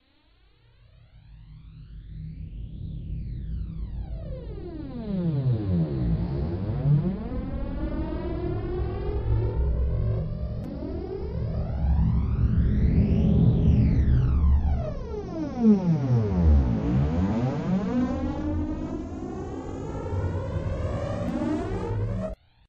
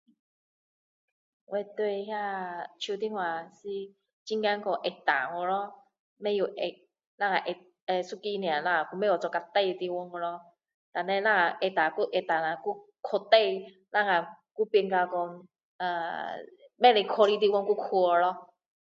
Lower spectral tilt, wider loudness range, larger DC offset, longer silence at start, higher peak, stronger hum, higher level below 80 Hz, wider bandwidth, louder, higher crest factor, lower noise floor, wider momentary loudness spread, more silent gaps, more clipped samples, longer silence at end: first, -10 dB/octave vs -5 dB/octave; first, 14 LU vs 6 LU; neither; second, 1.15 s vs 1.5 s; second, -8 dBFS vs -4 dBFS; neither; first, -30 dBFS vs -84 dBFS; about the same, 7 kHz vs 7.6 kHz; about the same, -27 LUFS vs -29 LUFS; second, 16 dB vs 24 dB; second, -60 dBFS vs under -90 dBFS; about the same, 15 LU vs 14 LU; second, none vs 4.13-4.26 s, 5.99-6.16 s, 7.07-7.18 s, 7.82-7.87 s, 10.74-10.92 s, 14.51-14.55 s, 15.63-15.79 s; neither; second, 0.35 s vs 0.55 s